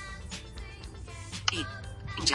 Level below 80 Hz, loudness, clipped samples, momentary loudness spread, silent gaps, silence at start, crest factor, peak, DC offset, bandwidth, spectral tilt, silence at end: -46 dBFS; -36 LUFS; under 0.1%; 14 LU; none; 0 s; 26 dB; -8 dBFS; under 0.1%; 11.5 kHz; -2.5 dB/octave; 0 s